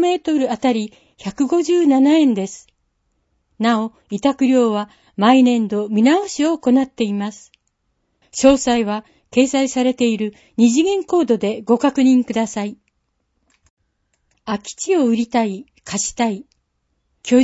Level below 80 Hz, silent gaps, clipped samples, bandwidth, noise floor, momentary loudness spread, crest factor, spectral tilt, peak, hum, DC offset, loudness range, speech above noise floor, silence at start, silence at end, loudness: -54 dBFS; 13.70-13.77 s; under 0.1%; 8 kHz; -69 dBFS; 13 LU; 18 dB; -4.5 dB/octave; 0 dBFS; none; under 0.1%; 5 LU; 53 dB; 0 s; 0 s; -17 LUFS